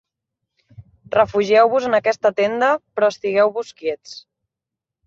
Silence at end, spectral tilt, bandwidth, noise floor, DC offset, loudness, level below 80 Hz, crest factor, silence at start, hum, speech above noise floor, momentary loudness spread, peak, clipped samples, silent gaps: 0.9 s; -4.5 dB/octave; 7.6 kHz; -85 dBFS; under 0.1%; -18 LUFS; -58 dBFS; 18 dB; 0.8 s; none; 68 dB; 12 LU; -2 dBFS; under 0.1%; none